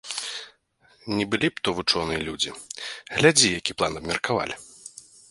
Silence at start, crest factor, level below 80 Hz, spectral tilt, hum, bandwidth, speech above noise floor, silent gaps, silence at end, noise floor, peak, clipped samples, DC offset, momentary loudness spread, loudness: 0.05 s; 24 dB; -52 dBFS; -2.5 dB/octave; none; 11.5 kHz; 37 dB; none; 0.3 s; -61 dBFS; -2 dBFS; under 0.1%; under 0.1%; 19 LU; -24 LUFS